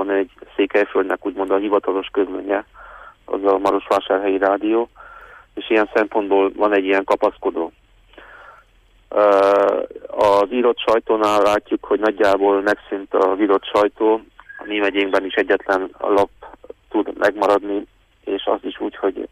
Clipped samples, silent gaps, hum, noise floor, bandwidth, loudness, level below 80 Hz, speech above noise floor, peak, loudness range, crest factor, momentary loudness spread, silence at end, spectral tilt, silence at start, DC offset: under 0.1%; none; none; -54 dBFS; 14 kHz; -19 LUFS; -54 dBFS; 36 dB; -4 dBFS; 4 LU; 14 dB; 9 LU; 0.05 s; -5 dB/octave; 0 s; under 0.1%